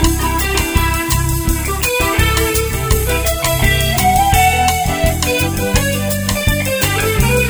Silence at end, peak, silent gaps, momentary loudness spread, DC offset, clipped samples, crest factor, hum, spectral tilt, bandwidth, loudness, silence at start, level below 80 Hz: 0 s; 0 dBFS; none; 4 LU; under 0.1%; under 0.1%; 14 dB; none; -4 dB/octave; over 20 kHz; -14 LUFS; 0 s; -20 dBFS